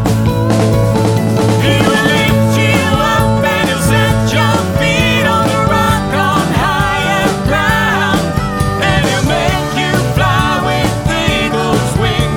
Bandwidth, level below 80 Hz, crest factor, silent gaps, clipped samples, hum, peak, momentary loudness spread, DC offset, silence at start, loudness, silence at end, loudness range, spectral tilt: 18 kHz; -26 dBFS; 12 dB; none; under 0.1%; none; 0 dBFS; 3 LU; under 0.1%; 0 s; -12 LUFS; 0 s; 2 LU; -5 dB/octave